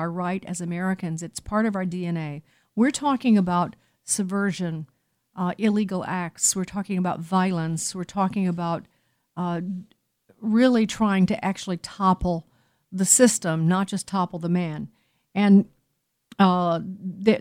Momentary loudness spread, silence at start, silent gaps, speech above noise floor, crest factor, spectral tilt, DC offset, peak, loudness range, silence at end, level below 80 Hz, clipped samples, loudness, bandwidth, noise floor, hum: 14 LU; 0 s; none; 52 dB; 22 dB; -5 dB/octave; under 0.1%; -2 dBFS; 5 LU; 0 s; -52 dBFS; under 0.1%; -24 LUFS; 16 kHz; -75 dBFS; none